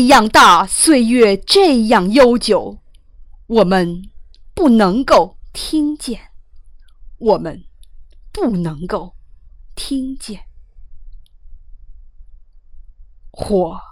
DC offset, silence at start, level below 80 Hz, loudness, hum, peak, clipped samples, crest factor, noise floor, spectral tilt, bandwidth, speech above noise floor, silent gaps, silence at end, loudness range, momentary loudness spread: under 0.1%; 0 s; -38 dBFS; -13 LUFS; none; -2 dBFS; under 0.1%; 14 dB; -40 dBFS; -4 dB/octave; 16.5 kHz; 27 dB; none; 0.1 s; 17 LU; 21 LU